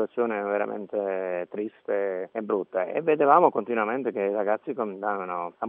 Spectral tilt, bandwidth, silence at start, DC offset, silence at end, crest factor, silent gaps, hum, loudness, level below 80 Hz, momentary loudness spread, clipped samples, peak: -5.5 dB/octave; 3.7 kHz; 0 s; under 0.1%; 0 s; 22 dB; none; none; -26 LUFS; -86 dBFS; 11 LU; under 0.1%; -4 dBFS